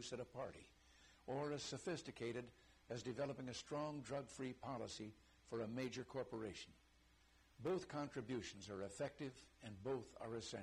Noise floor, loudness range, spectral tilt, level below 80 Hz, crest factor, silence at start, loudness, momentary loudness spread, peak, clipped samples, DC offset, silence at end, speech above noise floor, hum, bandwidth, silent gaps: -73 dBFS; 2 LU; -5 dB/octave; -74 dBFS; 14 dB; 0 s; -49 LUFS; 12 LU; -36 dBFS; under 0.1%; under 0.1%; 0 s; 24 dB; none; 13 kHz; none